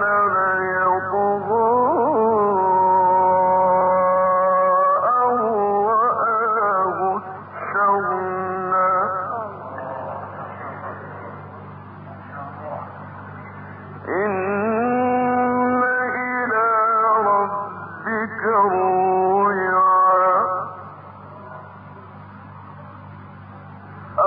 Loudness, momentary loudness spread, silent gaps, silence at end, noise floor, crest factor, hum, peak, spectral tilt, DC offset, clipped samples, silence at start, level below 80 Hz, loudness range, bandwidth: -19 LUFS; 22 LU; none; 0 s; -39 dBFS; 12 dB; none; -8 dBFS; -11.5 dB/octave; under 0.1%; under 0.1%; 0 s; -58 dBFS; 16 LU; 4.2 kHz